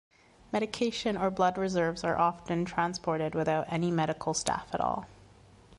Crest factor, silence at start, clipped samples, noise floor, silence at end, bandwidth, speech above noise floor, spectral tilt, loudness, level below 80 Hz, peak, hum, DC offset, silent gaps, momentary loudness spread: 22 dB; 0.5 s; under 0.1%; -56 dBFS; 0.05 s; 11.5 kHz; 26 dB; -5 dB/octave; -30 LUFS; -58 dBFS; -10 dBFS; none; under 0.1%; none; 5 LU